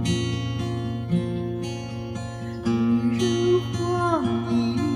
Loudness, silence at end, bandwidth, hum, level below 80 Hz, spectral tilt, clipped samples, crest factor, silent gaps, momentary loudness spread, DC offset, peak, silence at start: -25 LUFS; 0 s; 12 kHz; none; -48 dBFS; -6.5 dB/octave; under 0.1%; 14 dB; none; 10 LU; under 0.1%; -10 dBFS; 0 s